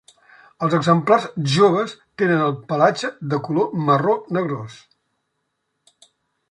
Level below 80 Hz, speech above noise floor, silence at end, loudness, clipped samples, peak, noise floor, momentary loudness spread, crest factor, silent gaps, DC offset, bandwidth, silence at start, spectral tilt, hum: -64 dBFS; 55 dB; 1.75 s; -19 LUFS; under 0.1%; -2 dBFS; -74 dBFS; 10 LU; 18 dB; none; under 0.1%; 11 kHz; 0.6 s; -6.5 dB/octave; none